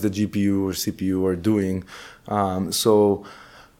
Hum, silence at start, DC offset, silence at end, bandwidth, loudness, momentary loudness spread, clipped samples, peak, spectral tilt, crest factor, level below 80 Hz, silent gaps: none; 0 s; under 0.1%; 0.35 s; 17.5 kHz; -22 LUFS; 12 LU; under 0.1%; -6 dBFS; -5.5 dB/octave; 18 dB; -54 dBFS; none